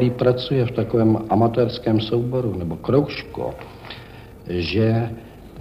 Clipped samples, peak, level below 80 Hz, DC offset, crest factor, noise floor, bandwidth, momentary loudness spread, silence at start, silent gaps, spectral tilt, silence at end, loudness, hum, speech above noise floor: under 0.1%; -4 dBFS; -46 dBFS; under 0.1%; 16 dB; -40 dBFS; 6 kHz; 19 LU; 0 s; none; -8.5 dB/octave; 0 s; -21 LUFS; none; 20 dB